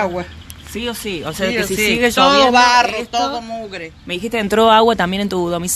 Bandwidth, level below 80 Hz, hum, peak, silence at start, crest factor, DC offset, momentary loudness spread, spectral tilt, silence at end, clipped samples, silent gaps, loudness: 13.5 kHz; -42 dBFS; none; 0 dBFS; 0 s; 16 dB; under 0.1%; 17 LU; -3.5 dB/octave; 0 s; under 0.1%; none; -15 LUFS